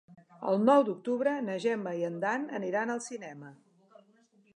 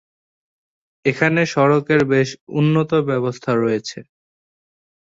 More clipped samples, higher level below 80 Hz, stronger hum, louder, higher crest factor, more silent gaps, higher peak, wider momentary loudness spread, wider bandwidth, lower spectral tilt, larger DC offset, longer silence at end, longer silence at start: neither; second, -86 dBFS vs -58 dBFS; neither; second, -30 LUFS vs -18 LUFS; about the same, 20 dB vs 18 dB; second, none vs 2.41-2.47 s; second, -10 dBFS vs -2 dBFS; first, 16 LU vs 7 LU; first, 11 kHz vs 7.8 kHz; about the same, -5.5 dB/octave vs -6.5 dB/octave; neither; about the same, 1 s vs 1 s; second, 0.1 s vs 1.05 s